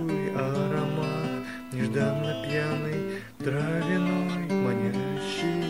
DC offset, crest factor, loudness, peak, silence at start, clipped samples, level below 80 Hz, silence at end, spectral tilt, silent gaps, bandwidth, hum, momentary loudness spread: 0.2%; 16 dB; -28 LUFS; -12 dBFS; 0 s; under 0.1%; -60 dBFS; 0 s; -6.5 dB/octave; none; 16 kHz; none; 6 LU